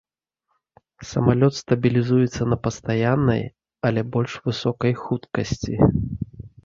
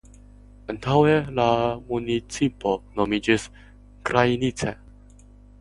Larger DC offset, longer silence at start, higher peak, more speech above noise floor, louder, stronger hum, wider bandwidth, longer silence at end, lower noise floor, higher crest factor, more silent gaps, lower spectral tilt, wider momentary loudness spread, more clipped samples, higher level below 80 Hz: neither; first, 1 s vs 0.7 s; about the same, -2 dBFS vs -2 dBFS; first, 55 dB vs 26 dB; about the same, -22 LUFS vs -23 LUFS; second, none vs 50 Hz at -45 dBFS; second, 7.6 kHz vs 11.5 kHz; second, 0.15 s vs 0.85 s; first, -76 dBFS vs -48 dBFS; about the same, 20 dB vs 22 dB; neither; first, -7 dB/octave vs -5.5 dB/octave; second, 9 LU vs 13 LU; neither; about the same, -42 dBFS vs -46 dBFS